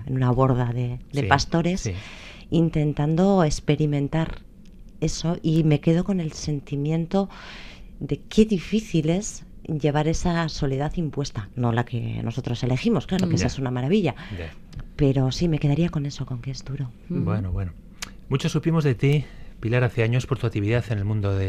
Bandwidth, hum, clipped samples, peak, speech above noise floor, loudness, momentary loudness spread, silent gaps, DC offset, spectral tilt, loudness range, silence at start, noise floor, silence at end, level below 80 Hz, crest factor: 11 kHz; none; under 0.1%; 0 dBFS; 21 dB; -24 LUFS; 14 LU; none; under 0.1%; -6.5 dB/octave; 3 LU; 0 s; -43 dBFS; 0 s; -40 dBFS; 22 dB